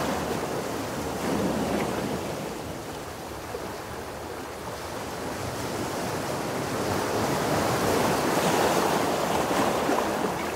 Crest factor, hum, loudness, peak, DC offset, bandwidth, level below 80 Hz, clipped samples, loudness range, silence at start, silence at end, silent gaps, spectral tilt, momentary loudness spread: 18 dB; none; -28 LUFS; -10 dBFS; under 0.1%; 16 kHz; -50 dBFS; under 0.1%; 10 LU; 0 s; 0 s; none; -4.5 dB/octave; 12 LU